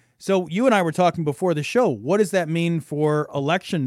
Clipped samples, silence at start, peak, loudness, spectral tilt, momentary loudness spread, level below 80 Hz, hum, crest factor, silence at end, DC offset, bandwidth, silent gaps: under 0.1%; 0.2 s; -6 dBFS; -21 LUFS; -6 dB/octave; 5 LU; -66 dBFS; none; 14 dB; 0 s; under 0.1%; 14.5 kHz; none